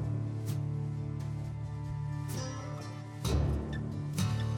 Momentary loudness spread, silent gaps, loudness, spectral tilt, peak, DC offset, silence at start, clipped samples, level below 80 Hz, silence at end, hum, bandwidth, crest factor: 7 LU; none; -36 LUFS; -6.5 dB/octave; -18 dBFS; under 0.1%; 0 s; under 0.1%; -44 dBFS; 0 s; none; 17 kHz; 16 dB